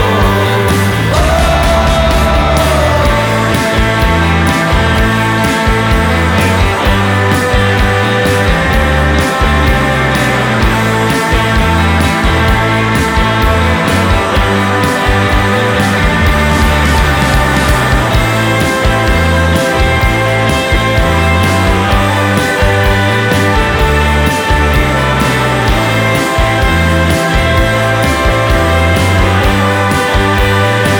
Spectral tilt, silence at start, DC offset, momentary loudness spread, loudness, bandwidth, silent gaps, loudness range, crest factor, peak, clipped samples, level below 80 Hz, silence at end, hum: -5 dB/octave; 0 s; under 0.1%; 1 LU; -10 LUFS; over 20 kHz; none; 0 LU; 10 dB; 0 dBFS; under 0.1%; -16 dBFS; 0 s; none